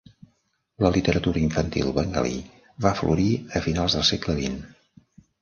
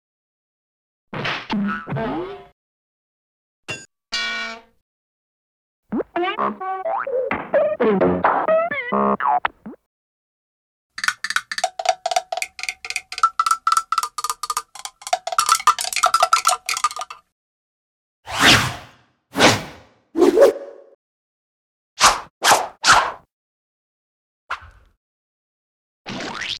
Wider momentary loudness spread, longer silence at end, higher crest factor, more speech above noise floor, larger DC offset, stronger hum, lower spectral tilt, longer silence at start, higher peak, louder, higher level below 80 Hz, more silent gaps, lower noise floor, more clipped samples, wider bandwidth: second, 7 LU vs 17 LU; first, 0.75 s vs 0 s; about the same, 20 dB vs 20 dB; first, 46 dB vs 31 dB; neither; neither; first, -5.5 dB/octave vs -2.5 dB/octave; second, 0.8 s vs 1.15 s; about the same, -4 dBFS vs -2 dBFS; second, -24 LUFS vs -19 LUFS; first, -40 dBFS vs -52 dBFS; second, none vs 2.52-3.63 s, 4.81-5.83 s, 9.86-10.90 s, 17.32-18.23 s, 20.95-21.96 s, 22.30-22.41 s, 23.32-24.47 s, 24.97-26.05 s; first, -70 dBFS vs -51 dBFS; neither; second, 7.4 kHz vs 18.5 kHz